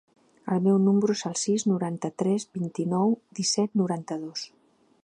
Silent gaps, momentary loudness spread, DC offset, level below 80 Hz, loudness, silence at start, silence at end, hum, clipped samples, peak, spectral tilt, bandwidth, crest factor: none; 11 LU; under 0.1%; -74 dBFS; -26 LUFS; 0.45 s; 0.55 s; none; under 0.1%; -12 dBFS; -5.5 dB/octave; 10.5 kHz; 16 dB